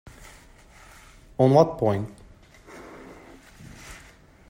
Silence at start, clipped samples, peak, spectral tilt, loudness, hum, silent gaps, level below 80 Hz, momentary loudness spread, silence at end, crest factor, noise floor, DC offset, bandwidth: 1.4 s; under 0.1%; -4 dBFS; -8 dB/octave; -21 LUFS; none; none; -54 dBFS; 29 LU; 0.55 s; 24 dB; -51 dBFS; under 0.1%; 16 kHz